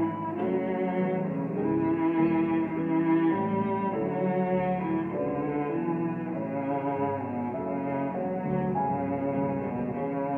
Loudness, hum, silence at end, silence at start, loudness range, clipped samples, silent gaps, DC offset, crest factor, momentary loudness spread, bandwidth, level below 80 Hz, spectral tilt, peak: -29 LUFS; none; 0 s; 0 s; 4 LU; under 0.1%; none; under 0.1%; 16 dB; 6 LU; 3.7 kHz; -60 dBFS; -11 dB/octave; -12 dBFS